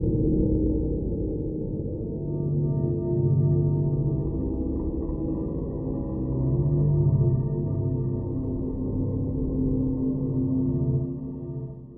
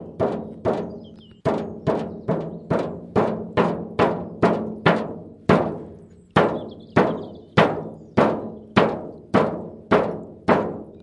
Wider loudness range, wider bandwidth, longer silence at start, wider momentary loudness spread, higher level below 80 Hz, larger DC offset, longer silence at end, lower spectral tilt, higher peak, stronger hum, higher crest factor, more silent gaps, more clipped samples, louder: about the same, 2 LU vs 3 LU; second, 1.3 kHz vs 11 kHz; about the same, 0 s vs 0 s; about the same, 8 LU vs 10 LU; first, -34 dBFS vs -52 dBFS; neither; about the same, 0 s vs 0 s; first, -16 dB/octave vs -7.5 dB/octave; second, -12 dBFS vs 0 dBFS; neither; second, 14 dB vs 22 dB; neither; neither; second, -26 LUFS vs -23 LUFS